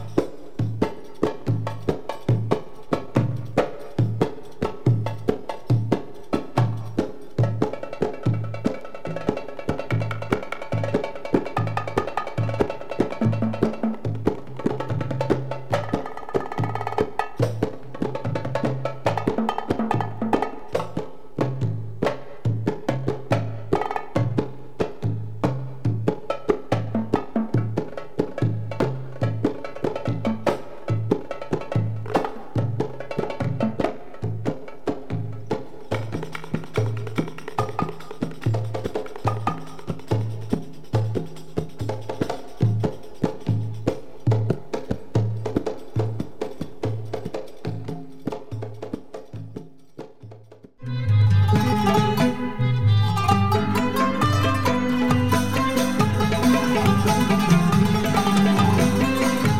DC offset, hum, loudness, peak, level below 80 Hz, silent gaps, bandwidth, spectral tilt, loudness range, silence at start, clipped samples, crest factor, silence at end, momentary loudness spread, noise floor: 2%; none; -25 LUFS; -4 dBFS; -50 dBFS; none; 15.5 kHz; -7 dB/octave; 8 LU; 0 s; under 0.1%; 20 dB; 0 s; 12 LU; -46 dBFS